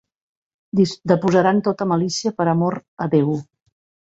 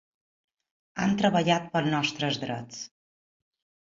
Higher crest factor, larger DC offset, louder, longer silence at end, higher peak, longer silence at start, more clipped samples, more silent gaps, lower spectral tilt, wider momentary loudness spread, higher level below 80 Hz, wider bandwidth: about the same, 18 dB vs 20 dB; neither; first, -19 LUFS vs -27 LUFS; second, 0.7 s vs 1.05 s; first, -2 dBFS vs -10 dBFS; second, 0.75 s vs 0.95 s; neither; first, 2.88-2.97 s vs none; first, -6.5 dB/octave vs -5 dB/octave; second, 8 LU vs 17 LU; about the same, -60 dBFS vs -64 dBFS; about the same, 8 kHz vs 7.6 kHz